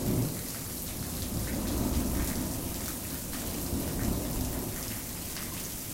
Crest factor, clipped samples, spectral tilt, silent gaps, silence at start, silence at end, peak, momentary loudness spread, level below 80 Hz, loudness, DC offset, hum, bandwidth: 16 dB; under 0.1%; -4.5 dB/octave; none; 0 s; 0 s; -18 dBFS; 5 LU; -40 dBFS; -33 LUFS; under 0.1%; none; 17 kHz